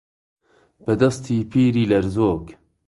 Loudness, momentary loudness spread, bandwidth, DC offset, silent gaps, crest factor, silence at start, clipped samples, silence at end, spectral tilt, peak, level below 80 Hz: -20 LUFS; 8 LU; 11.5 kHz; under 0.1%; none; 18 dB; 0.85 s; under 0.1%; 0.35 s; -7.5 dB/octave; -2 dBFS; -46 dBFS